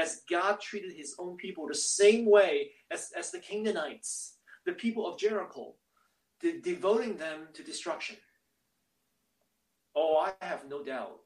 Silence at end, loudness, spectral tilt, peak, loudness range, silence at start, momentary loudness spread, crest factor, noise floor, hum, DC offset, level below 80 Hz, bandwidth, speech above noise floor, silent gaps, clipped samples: 0.1 s; -31 LUFS; -2.5 dB/octave; -10 dBFS; 7 LU; 0 s; 17 LU; 22 dB; -79 dBFS; none; under 0.1%; -82 dBFS; 12 kHz; 48 dB; none; under 0.1%